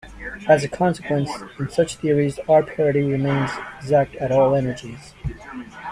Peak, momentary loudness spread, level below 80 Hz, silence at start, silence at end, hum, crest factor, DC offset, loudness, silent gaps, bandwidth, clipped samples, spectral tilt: -2 dBFS; 16 LU; -46 dBFS; 0.05 s; 0 s; none; 18 dB; under 0.1%; -20 LUFS; none; 11.5 kHz; under 0.1%; -6.5 dB/octave